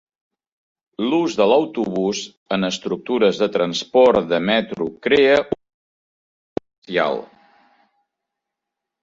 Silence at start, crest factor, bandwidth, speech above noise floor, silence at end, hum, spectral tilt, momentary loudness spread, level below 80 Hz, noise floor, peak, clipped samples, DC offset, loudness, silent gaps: 1 s; 18 dB; 7.8 kHz; 65 dB; 1.75 s; none; -5 dB/octave; 15 LU; -58 dBFS; -83 dBFS; -2 dBFS; under 0.1%; under 0.1%; -19 LUFS; 2.37-2.46 s, 5.74-6.56 s, 6.78-6.82 s